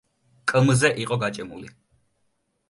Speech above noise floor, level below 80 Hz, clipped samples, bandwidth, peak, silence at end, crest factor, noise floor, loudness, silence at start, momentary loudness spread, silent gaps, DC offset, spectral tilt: 50 dB; -58 dBFS; under 0.1%; 11.5 kHz; -4 dBFS; 1 s; 20 dB; -72 dBFS; -22 LUFS; 0.45 s; 18 LU; none; under 0.1%; -5 dB/octave